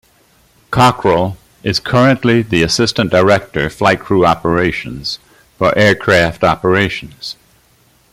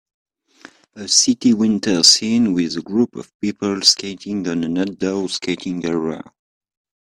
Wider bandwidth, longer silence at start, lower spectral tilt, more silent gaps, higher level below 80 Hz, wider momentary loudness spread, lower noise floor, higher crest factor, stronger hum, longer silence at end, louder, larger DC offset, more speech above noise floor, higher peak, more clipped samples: about the same, 16 kHz vs 15 kHz; second, 0.7 s vs 0.95 s; first, -5 dB/octave vs -3 dB/octave; second, none vs 3.34-3.40 s; first, -40 dBFS vs -58 dBFS; about the same, 12 LU vs 14 LU; first, -52 dBFS vs -46 dBFS; second, 14 dB vs 20 dB; neither; about the same, 0.8 s vs 0.85 s; first, -13 LUFS vs -17 LUFS; neither; first, 39 dB vs 28 dB; about the same, 0 dBFS vs 0 dBFS; neither